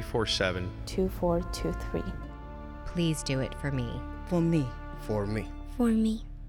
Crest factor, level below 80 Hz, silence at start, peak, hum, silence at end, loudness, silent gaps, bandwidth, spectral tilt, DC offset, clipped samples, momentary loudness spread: 16 dB; -40 dBFS; 0 s; -14 dBFS; none; 0 s; -31 LUFS; none; 18 kHz; -6 dB/octave; under 0.1%; under 0.1%; 14 LU